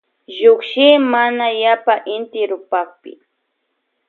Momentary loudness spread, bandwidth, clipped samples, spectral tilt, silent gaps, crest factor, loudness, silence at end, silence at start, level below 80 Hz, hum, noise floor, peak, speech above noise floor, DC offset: 11 LU; 4.4 kHz; under 0.1%; -5 dB/octave; none; 16 dB; -15 LUFS; 1 s; 0.3 s; -76 dBFS; none; -71 dBFS; 0 dBFS; 56 dB; under 0.1%